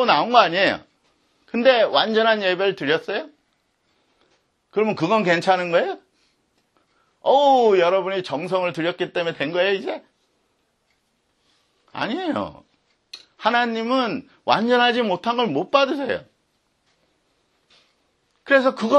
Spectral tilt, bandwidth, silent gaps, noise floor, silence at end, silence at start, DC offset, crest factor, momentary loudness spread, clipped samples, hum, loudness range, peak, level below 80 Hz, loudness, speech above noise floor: -5 dB/octave; 9.6 kHz; none; -68 dBFS; 0 s; 0 s; under 0.1%; 22 dB; 13 LU; under 0.1%; none; 7 LU; 0 dBFS; -68 dBFS; -20 LUFS; 49 dB